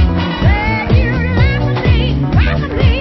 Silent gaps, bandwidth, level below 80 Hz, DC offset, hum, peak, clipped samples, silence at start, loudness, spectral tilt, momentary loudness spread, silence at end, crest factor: none; 6 kHz; -16 dBFS; under 0.1%; none; 0 dBFS; under 0.1%; 0 s; -13 LUFS; -8.5 dB/octave; 2 LU; 0 s; 12 dB